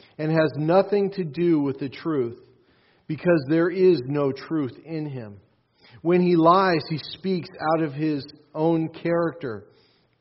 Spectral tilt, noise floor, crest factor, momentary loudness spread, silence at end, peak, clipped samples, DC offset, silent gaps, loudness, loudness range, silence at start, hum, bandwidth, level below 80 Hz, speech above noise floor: -6 dB/octave; -61 dBFS; 20 dB; 13 LU; 0.6 s; -4 dBFS; under 0.1%; under 0.1%; none; -23 LUFS; 2 LU; 0.2 s; none; 5.8 kHz; -66 dBFS; 38 dB